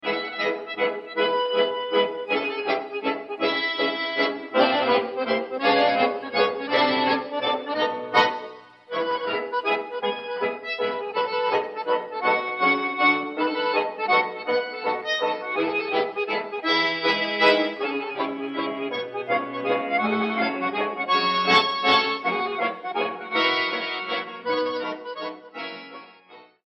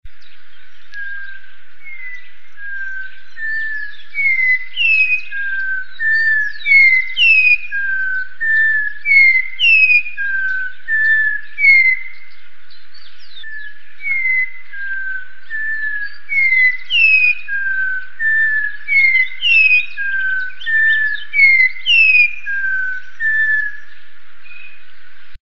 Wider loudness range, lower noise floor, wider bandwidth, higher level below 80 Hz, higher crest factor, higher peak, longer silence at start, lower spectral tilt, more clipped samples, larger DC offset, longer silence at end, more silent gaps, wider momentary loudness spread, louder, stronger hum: second, 4 LU vs 11 LU; about the same, -50 dBFS vs -48 dBFS; about the same, 8.2 kHz vs 8.4 kHz; second, -76 dBFS vs -54 dBFS; about the same, 18 dB vs 16 dB; second, -6 dBFS vs 0 dBFS; about the same, 0.05 s vs 0 s; first, -4.5 dB/octave vs 0.5 dB/octave; neither; second, under 0.1% vs 9%; first, 0.2 s vs 0 s; neither; second, 9 LU vs 19 LU; second, -24 LUFS vs -12 LUFS; neither